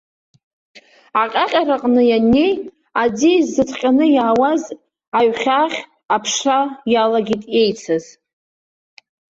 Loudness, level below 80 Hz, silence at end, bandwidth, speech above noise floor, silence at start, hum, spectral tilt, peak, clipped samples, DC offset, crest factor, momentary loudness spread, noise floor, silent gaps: -16 LUFS; -52 dBFS; 1.35 s; 7.8 kHz; over 74 dB; 0.75 s; none; -4 dB/octave; -4 dBFS; under 0.1%; under 0.1%; 14 dB; 9 LU; under -90 dBFS; 5.08-5.12 s